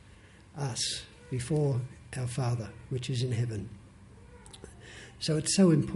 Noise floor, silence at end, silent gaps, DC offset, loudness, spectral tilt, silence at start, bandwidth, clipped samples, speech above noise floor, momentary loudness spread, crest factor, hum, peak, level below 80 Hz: -54 dBFS; 0 s; none; under 0.1%; -31 LUFS; -5.5 dB/octave; 0.55 s; 11.5 kHz; under 0.1%; 25 dB; 23 LU; 18 dB; none; -12 dBFS; -54 dBFS